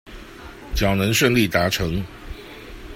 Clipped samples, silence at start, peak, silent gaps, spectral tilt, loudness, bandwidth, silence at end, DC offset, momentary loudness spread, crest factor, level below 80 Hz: under 0.1%; 0.05 s; -2 dBFS; none; -4.5 dB/octave; -20 LUFS; 16.5 kHz; 0 s; under 0.1%; 22 LU; 20 dB; -36 dBFS